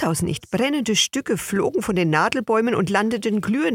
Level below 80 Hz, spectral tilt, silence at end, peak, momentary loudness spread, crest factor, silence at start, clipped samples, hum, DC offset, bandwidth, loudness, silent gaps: -52 dBFS; -4 dB/octave; 0 s; -2 dBFS; 4 LU; 18 dB; 0 s; under 0.1%; none; under 0.1%; 17 kHz; -21 LUFS; none